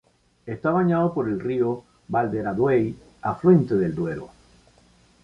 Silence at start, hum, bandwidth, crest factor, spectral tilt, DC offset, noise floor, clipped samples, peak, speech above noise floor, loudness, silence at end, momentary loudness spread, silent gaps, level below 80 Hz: 0.45 s; none; 7 kHz; 18 dB; -10 dB/octave; under 0.1%; -57 dBFS; under 0.1%; -4 dBFS; 35 dB; -23 LUFS; 0.95 s; 13 LU; none; -54 dBFS